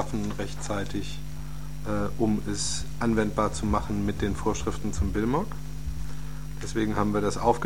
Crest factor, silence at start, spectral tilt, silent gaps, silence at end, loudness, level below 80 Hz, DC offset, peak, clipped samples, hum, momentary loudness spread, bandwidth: 20 dB; 0 s; -5.5 dB/octave; none; 0 s; -29 LUFS; -38 dBFS; 2%; -10 dBFS; under 0.1%; none; 12 LU; 17 kHz